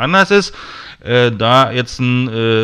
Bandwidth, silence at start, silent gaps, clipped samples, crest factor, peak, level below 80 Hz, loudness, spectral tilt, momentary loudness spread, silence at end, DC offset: 11.5 kHz; 0 s; none; under 0.1%; 14 dB; 0 dBFS; -44 dBFS; -13 LUFS; -5.5 dB/octave; 18 LU; 0 s; under 0.1%